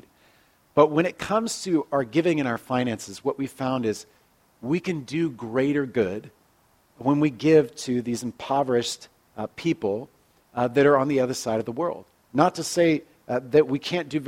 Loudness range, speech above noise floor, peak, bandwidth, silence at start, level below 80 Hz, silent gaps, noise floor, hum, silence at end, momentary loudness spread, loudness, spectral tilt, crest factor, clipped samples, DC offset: 4 LU; 39 dB; -2 dBFS; 16 kHz; 0.75 s; -64 dBFS; none; -62 dBFS; none; 0 s; 11 LU; -24 LUFS; -5.5 dB/octave; 22 dB; under 0.1%; under 0.1%